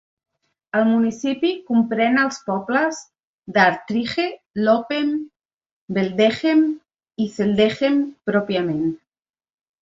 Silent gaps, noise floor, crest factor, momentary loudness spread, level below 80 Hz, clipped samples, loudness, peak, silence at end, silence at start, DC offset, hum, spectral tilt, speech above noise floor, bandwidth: 3.24-3.38 s, 4.46-4.50 s, 5.36-5.49 s, 5.66-5.88 s; under -90 dBFS; 18 dB; 9 LU; -60 dBFS; under 0.1%; -20 LUFS; -2 dBFS; 0.85 s; 0.75 s; under 0.1%; none; -5.5 dB/octave; over 71 dB; 7.8 kHz